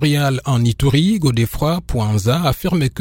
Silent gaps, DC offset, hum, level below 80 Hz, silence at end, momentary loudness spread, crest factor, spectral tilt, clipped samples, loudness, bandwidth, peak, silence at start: none; under 0.1%; none; -32 dBFS; 0 s; 4 LU; 14 dB; -6 dB/octave; under 0.1%; -17 LUFS; 16.5 kHz; -2 dBFS; 0 s